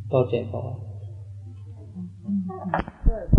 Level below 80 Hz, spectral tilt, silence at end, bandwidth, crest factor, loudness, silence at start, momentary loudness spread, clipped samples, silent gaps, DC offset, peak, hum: -32 dBFS; -10 dB/octave; 0 s; 5.4 kHz; 22 dB; -29 LUFS; 0 s; 16 LU; under 0.1%; none; under 0.1%; -4 dBFS; none